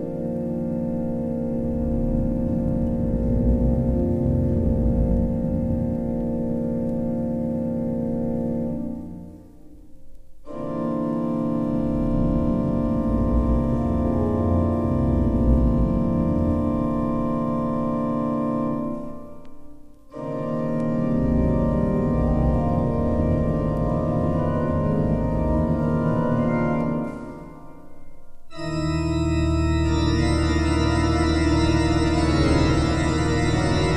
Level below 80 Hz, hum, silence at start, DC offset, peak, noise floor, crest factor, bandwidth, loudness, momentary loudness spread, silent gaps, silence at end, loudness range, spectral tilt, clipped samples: -30 dBFS; none; 0 s; under 0.1%; -6 dBFS; -43 dBFS; 16 dB; 10.5 kHz; -23 LUFS; 7 LU; none; 0 s; 6 LU; -7.5 dB/octave; under 0.1%